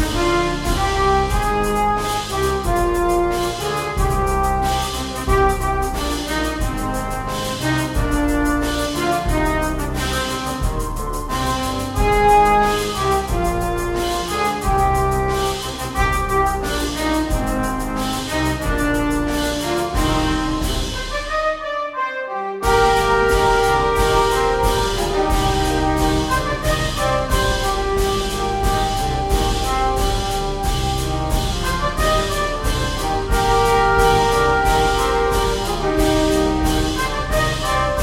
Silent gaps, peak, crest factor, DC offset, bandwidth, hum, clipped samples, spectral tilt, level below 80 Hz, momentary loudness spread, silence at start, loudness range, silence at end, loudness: none; -2 dBFS; 16 dB; under 0.1%; 16.5 kHz; none; under 0.1%; -4.5 dB/octave; -26 dBFS; 7 LU; 0 s; 4 LU; 0 s; -19 LUFS